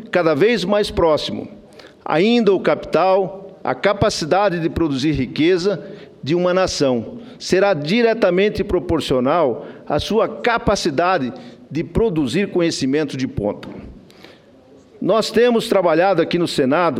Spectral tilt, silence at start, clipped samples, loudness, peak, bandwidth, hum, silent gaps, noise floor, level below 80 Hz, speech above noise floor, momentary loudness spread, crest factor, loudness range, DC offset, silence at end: -5.5 dB/octave; 0 s; under 0.1%; -18 LUFS; 0 dBFS; 15 kHz; none; none; -47 dBFS; -42 dBFS; 30 dB; 12 LU; 18 dB; 3 LU; under 0.1%; 0 s